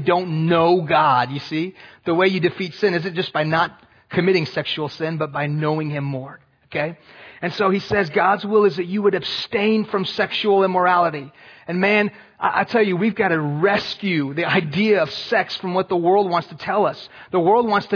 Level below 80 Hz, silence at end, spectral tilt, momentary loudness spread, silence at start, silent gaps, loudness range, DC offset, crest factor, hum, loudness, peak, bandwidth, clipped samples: -60 dBFS; 0 s; -7 dB/octave; 9 LU; 0 s; none; 4 LU; under 0.1%; 16 dB; none; -20 LUFS; -4 dBFS; 5.4 kHz; under 0.1%